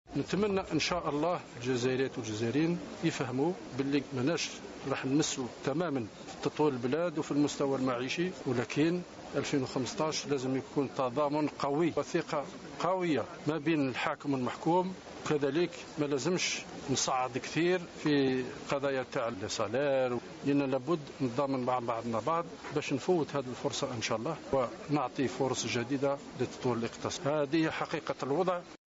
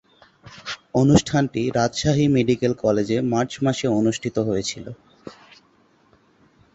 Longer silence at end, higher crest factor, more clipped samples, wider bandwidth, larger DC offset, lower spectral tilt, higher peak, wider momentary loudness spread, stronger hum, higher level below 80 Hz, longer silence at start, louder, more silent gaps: second, 0.15 s vs 1.45 s; about the same, 20 dB vs 20 dB; neither; about the same, 8 kHz vs 8.2 kHz; neither; about the same, -5 dB/octave vs -6 dB/octave; second, -12 dBFS vs -2 dBFS; second, 5 LU vs 17 LU; neither; second, -64 dBFS vs -48 dBFS; second, 0.1 s vs 0.45 s; second, -33 LUFS vs -21 LUFS; neither